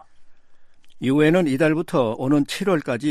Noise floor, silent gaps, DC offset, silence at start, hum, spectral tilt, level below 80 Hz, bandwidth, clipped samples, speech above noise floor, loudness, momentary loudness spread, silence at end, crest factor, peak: -43 dBFS; none; under 0.1%; 0.2 s; none; -6.5 dB/octave; -56 dBFS; 14 kHz; under 0.1%; 24 dB; -20 LUFS; 5 LU; 0 s; 16 dB; -6 dBFS